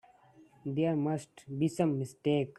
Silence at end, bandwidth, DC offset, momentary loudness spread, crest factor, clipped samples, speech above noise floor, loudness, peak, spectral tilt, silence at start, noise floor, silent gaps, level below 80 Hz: 0.05 s; 12.5 kHz; under 0.1%; 9 LU; 16 dB; under 0.1%; 29 dB; -33 LUFS; -16 dBFS; -7.5 dB/octave; 0.65 s; -61 dBFS; none; -72 dBFS